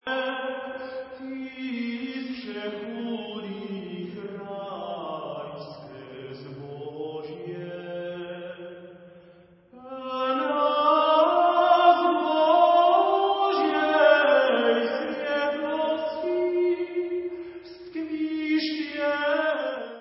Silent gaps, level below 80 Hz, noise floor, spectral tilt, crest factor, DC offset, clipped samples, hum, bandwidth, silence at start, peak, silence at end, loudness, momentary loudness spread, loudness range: none; -70 dBFS; -54 dBFS; -8.5 dB/octave; 20 dB; under 0.1%; under 0.1%; none; 5.8 kHz; 0.05 s; -6 dBFS; 0 s; -24 LUFS; 19 LU; 17 LU